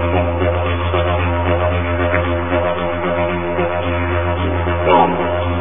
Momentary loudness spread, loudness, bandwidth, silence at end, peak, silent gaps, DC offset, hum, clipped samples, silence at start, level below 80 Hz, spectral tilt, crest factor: 5 LU; -17 LUFS; 3.7 kHz; 0 s; 0 dBFS; none; 3%; none; under 0.1%; 0 s; -26 dBFS; -12 dB/octave; 16 dB